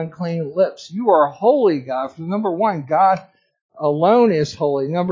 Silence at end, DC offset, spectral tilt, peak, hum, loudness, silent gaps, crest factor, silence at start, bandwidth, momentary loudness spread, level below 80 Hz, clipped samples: 0 s; under 0.1%; -7.5 dB/octave; -2 dBFS; none; -18 LUFS; 3.61-3.69 s; 16 dB; 0 s; 7.6 kHz; 9 LU; -62 dBFS; under 0.1%